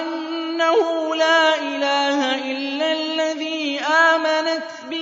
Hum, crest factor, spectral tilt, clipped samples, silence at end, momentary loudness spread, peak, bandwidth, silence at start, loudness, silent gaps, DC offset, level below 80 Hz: none; 16 dB; -1 dB/octave; under 0.1%; 0 s; 10 LU; -4 dBFS; 7.8 kHz; 0 s; -19 LUFS; none; under 0.1%; -78 dBFS